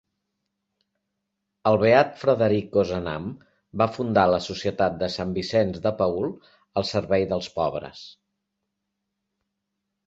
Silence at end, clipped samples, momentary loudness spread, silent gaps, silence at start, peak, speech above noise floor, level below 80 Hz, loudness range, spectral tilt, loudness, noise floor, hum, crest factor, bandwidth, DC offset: 1.95 s; under 0.1%; 12 LU; none; 1.65 s; -4 dBFS; 58 dB; -52 dBFS; 7 LU; -6.5 dB/octave; -24 LUFS; -81 dBFS; none; 22 dB; 8 kHz; under 0.1%